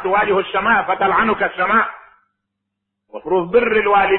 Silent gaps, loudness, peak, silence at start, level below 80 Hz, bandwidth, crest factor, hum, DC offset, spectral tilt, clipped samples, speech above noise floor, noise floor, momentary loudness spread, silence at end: none; -16 LUFS; -2 dBFS; 0 s; -48 dBFS; 4.2 kHz; 16 dB; none; under 0.1%; -9 dB/octave; under 0.1%; 62 dB; -78 dBFS; 7 LU; 0 s